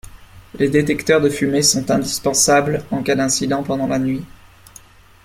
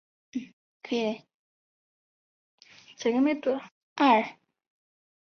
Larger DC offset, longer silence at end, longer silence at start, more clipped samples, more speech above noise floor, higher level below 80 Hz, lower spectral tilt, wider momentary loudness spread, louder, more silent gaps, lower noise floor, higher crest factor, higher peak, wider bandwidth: neither; about the same, 1 s vs 1.1 s; second, 0.15 s vs 0.35 s; neither; second, 28 dB vs over 65 dB; first, -46 dBFS vs -78 dBFS; about the same, -3.5 dB/octave vs -4.5 dB/octave; second, 8 LU vs 18 LU; first, -17 LUFS vs -27 LUFS; second, none vs 0.53-0.80 s, 1.34-2.58 s, 3.71-3.96 s; second, -45 dBFS vs under -90 dBFS; second, 16 dB vs 22 dB; first, -2 dBFS vs -10 dBFS; first, 16.5 kHz vs 6.6 kHz